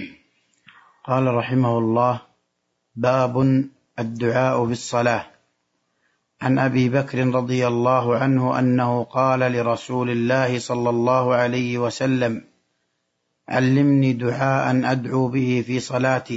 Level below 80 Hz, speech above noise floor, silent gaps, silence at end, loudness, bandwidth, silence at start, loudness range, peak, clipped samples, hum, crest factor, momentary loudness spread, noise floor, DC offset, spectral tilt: -62 dBFS; 54 dB; none; 0 s; -21 LUFS; 8 kHz; 0 s; 3 LU; -4 dBFS; under 0.1%; none; 16 dB; 6 LU; -74 dBFS; under 0.1%; -7 dB/octave